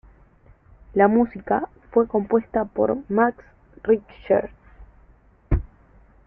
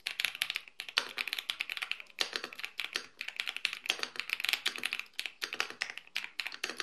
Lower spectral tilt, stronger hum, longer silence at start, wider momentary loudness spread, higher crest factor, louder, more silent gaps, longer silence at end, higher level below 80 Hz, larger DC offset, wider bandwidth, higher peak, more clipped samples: first, -12 dB/octave vs 1.5 dB/octave; neither; first, 0.95 s vs 0.05 s; first, 9 LU vs 6 LU; second, 20 dB vs 34 dB; first, -22 LUFS vs -35 LUFS; neither; first, 0.6 s vs 0 s; first, -38 dBFS vs -84 dBFS; neither; second, 3.4 kHz vs 13 kHz; about the same, -4 dBFS vs -4 dBFS; neither